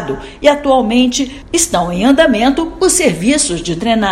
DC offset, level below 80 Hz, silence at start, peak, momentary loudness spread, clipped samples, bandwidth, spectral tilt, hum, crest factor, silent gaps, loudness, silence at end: under 0.1%; -34 dBFS; 0 s; 0 dBFS; 6 LU; 0.3%; 15.5 kHz; -3.5 dB/octave; none; 12 dB; none; -12 LUFS; 0 s